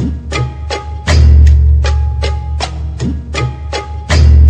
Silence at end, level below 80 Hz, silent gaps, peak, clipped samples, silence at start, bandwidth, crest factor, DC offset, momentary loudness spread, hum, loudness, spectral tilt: 0 s; -12 dBFS; none; 0 dBFS; 0.4%; 0 s; 8.6 kHz; 10 dB; under 0.1%; 13 LU; none; -13 LUFS; -6 dB/octave